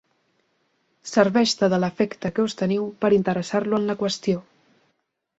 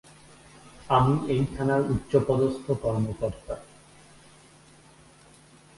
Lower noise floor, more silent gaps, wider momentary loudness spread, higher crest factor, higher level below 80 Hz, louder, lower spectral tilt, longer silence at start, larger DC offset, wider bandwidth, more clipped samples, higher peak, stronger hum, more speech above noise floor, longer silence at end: first, -73 dBFS vs -54 dBFS; neither; second, 6 LU vs 11 LU; about the same, 20 dB vs 20 dB; second, -62 dBFS vs -48 dBFS; first, -22 LUFS vs -26 LUFS; second, -5.5 dB/octave vs -7.5 dB/octave; first, 1.05 s vs 0.65 s; neither; second, 8.2 kHz vs 11.5 kHz; neither; first, -2 dBFS vs -8 dBFS; neither; first, 51 dB vs 29 dB; second, 1 s vs 2.15 s